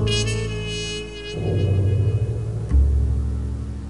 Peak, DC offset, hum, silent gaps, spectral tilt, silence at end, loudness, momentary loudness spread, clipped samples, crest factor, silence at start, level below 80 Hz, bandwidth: -8 dBFS; 0.4%; none; none; -5.5 dB/octave; 0 s; -23 LUFS; 8 LU; under 0.1%; 14 dB; 0 s; -26 dBFS; 11.5 kHz